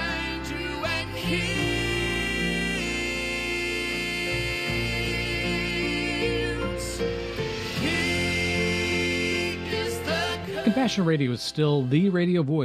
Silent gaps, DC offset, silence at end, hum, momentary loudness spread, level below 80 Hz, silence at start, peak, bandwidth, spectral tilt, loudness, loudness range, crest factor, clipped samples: none; under 0.1%; 0 s; none; 6 LU; -42 dBFS; 0 s; -10 dBFS; 15 kHz; -5 dB/octave; -26 LUFS; 2 LU; 16 dB; under 0.1%